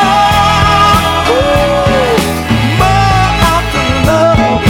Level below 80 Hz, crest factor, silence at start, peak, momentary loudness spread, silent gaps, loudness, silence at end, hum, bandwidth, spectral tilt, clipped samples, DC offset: -22 dBFS; 8 dB; 0 s; 0 dBFS; 4 LU; none; -9 LUFS; 0 s; none; 19 kHz; -5 dB/octave; 0.4%; under 0.1%